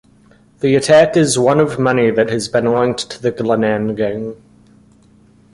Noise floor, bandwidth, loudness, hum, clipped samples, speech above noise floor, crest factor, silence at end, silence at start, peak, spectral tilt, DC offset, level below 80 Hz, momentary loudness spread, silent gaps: -49 dBFS; 11.5 kHz; -15 LUFS; none; under 0.1%; 35 dB; 14 dB; 1.2 s; 0.6 s; 0 dBFS; -5 dB/octave; under 0.1%; -50 dBFS; 10 LU; none